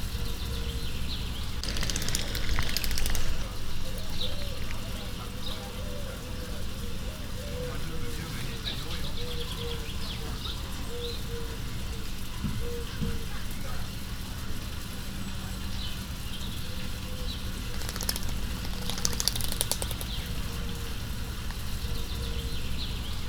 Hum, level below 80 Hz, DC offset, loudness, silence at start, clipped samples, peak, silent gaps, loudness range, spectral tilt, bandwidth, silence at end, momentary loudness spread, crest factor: none; -34 dBFS; under 0.1%; -34 LUFS; 0 s; under 0.1%; -2 dBFS; none; 5 LU; -3.5 dB/octave; over 20 kHz; 0 s; 7 LU; 28 dB